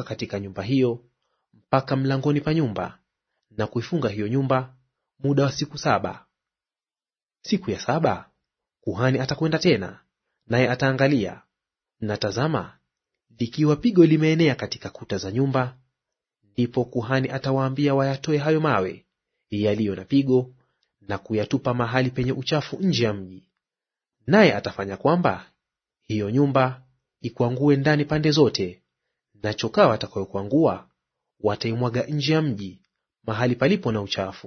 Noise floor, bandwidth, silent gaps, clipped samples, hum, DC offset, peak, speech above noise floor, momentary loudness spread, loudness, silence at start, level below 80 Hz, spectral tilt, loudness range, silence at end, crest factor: under -90 dBFS; 6.6 kHz; none; under 0.1%; none; under 0.1%; -2 dBFS; over 68 dB; 14 LU; -23 LUFS; 0 s; -58 dBFS; -6.5 dB/octave; 4 LU; 0 s; 22 dB